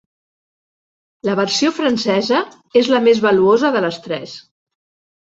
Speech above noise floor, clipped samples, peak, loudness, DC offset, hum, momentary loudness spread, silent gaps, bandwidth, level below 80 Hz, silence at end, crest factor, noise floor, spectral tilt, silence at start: over 74 dB; under 0.1%; -2 dBFS; -16 LUFS; under 0.1%; none; 13 LU; none; 8 kHz; -60 dBFS; 0.8 s; 16 dB; under -90 dBFS; -4.5 dB/octave; 1.25 s